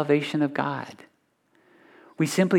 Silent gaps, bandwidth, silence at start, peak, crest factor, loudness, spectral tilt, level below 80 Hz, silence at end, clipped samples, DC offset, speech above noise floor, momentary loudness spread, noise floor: none; 17.5 kHz; 0 s; -8 dBFS; 18 dB; -26 LUFS; -6 dB/octave; -78 dBFS; 0 s; under 0.1%; under 0.1%; 43 dB; 11 LU; -67 dBFS